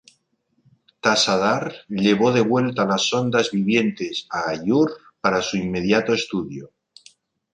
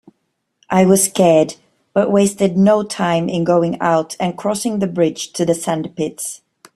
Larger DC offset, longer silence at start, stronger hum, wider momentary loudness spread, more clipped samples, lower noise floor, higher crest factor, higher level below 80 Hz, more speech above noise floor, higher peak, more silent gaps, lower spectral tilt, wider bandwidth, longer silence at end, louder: neither; first, 1.05 s vs 0.7 s; neither; about the same, 9 LU vs 10 LU; neither; about the same, -69 dBFS vs -70 dBFS; about the same, 18 dB vs 16 dB; about the same, -56 dBFS vs -56 dBFS; second, 48 dB vs 55 dB; about the same, -4 dBFS vs -2 dBFS; neither; about the same, -4.5 dB/octave vs -5 dB/octave; second, 10.5 kHz vs 14.5 kHz; first, 0.9 s vs 0.4 s; second, -21 LUFS vs -16 LUFS